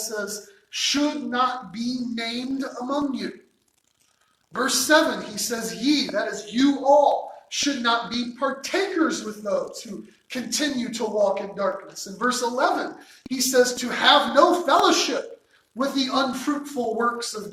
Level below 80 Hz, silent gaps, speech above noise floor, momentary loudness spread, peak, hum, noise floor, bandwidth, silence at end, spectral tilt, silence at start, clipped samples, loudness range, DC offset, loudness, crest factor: -66 dBFS; none; 44 dB; 15 LU; -2 dBFS; none; -67 dBFS; 16.5 kHz; 0 s; -2 dB/octave; 0 s; under 0.1%; 6 LU; under 0.1%; -23 LUFS; 22 dB